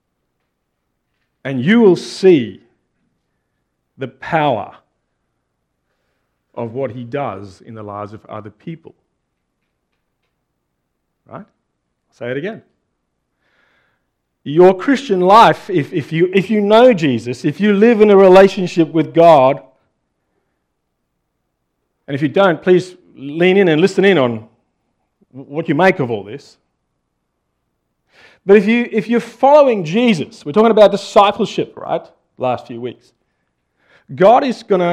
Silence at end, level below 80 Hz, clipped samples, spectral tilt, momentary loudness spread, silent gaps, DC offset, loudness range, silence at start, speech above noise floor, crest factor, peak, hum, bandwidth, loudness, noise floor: 0 s; -58 dBFS; under 0.1%; -6.5 dB/octave; 21 LU; none; under 0.1%; 18 LU; 1.45 s; 58 dB; 16 dB; 0 dBFS; none; 10.5 kHz; -13 LUFS; -71 dBFS